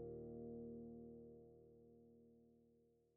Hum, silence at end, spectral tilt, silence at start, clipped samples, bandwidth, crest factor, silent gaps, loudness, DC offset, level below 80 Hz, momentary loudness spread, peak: none; 0 s; -7 dB/octave; 0 s; under 0.1%; 1.9 kHz; 14 dB; none; -57 LUFS; under 0.1%; -76 dBFS; 15 LU; -44 dBFS